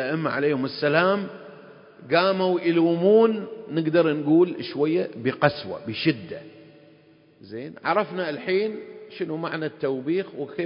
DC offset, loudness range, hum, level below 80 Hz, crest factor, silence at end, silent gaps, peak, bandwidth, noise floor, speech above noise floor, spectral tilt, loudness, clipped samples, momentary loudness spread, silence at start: under 0.1%; 7 LU; none; -68 dBFS; 20 dB; 0 s; none; -4 dBFS; 5.4 kHz; -55 dBFS; 32 dB; -10.5 dB/octave; -23 LUFS; under 0.1%; 14 LU; 0 s